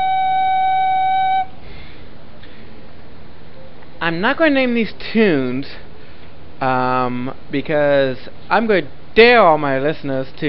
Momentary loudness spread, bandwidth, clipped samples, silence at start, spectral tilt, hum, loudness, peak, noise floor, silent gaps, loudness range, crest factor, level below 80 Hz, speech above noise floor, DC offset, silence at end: 13 LU; 5.8 kHz; under 0.1%; 0 s; -9 dB/octave; none; -16 LUFS; 0 dBFS; -40 dBFS; none; 7 LU; 18 dB; -44 dBFS; 24 dB; 5%; 0 s